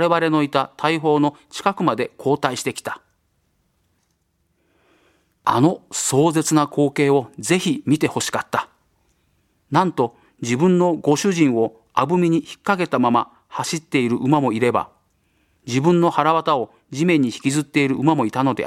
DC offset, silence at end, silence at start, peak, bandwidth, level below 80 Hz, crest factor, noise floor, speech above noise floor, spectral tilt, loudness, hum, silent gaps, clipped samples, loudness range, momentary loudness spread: under 0.1%; 0 s; 0 s; 0 dBFS; 15.5 kHz; -62 dBFS; 20 dB; -68 dBFS; 49 dB; -5.5 dB/octave; -19 LUFS; none; none; under 0.1%; 6 LU; 8 LU